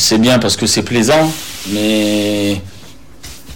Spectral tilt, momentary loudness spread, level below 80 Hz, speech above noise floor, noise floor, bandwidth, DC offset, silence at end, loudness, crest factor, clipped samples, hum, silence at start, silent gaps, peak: -3.5 dB/octave; 12 LU; -44 dBFS; 25 dB; -38 dBFS; 17.5 kHz; 2%; 0 s; -13 LUFS; 10 dB; under 0.1%; none; 0 s; none; -4 dBFS